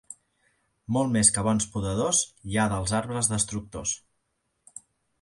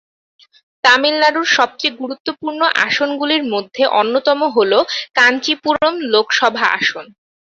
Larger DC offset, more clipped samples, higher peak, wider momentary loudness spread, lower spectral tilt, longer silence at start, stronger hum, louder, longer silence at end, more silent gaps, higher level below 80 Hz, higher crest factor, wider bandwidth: neither; neither; second, -4 dBFS vs 0 dBFS; first, 26 LU vs 8 LU; first, -4 dB/octave vs -2 dB/octave; second, 0.1 s vs 0.85 s; neither; second, -25 LUFS vs -15 LUFS; first, 1.25 s vs 0.55 s; second, none vs 2.20-2.25 s; first, -50 dBFS vs -62 dBFS; first, 24 dB vs 16 dB; first, 11.5 kHz vs 8 kHz